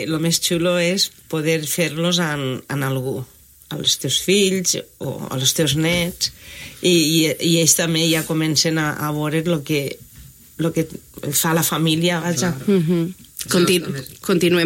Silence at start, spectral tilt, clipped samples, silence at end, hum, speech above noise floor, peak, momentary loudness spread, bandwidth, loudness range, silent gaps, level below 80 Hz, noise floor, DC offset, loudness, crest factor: 0 s; -3.5 dB/octave; under 0.1%; 0 s; none; 24 dB; -2 dBFS; 12 LU; 16.5 kHz; 4 LU; none; -52 dBFS; -44 dBFS; under 0.1%; -19 LUFS; 18 dB